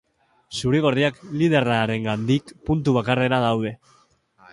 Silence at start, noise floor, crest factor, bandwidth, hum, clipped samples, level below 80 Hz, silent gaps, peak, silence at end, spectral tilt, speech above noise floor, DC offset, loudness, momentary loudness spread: 0.5 s; -58 dBFS; 18 dB; 11.5 kHz; none; under 0.1%; -48 dBFS; none; -4 dBFS; 0.8 s; -6.5 dB/octave; 37 dB; under 0.1%; -22 LUFS; 7 LU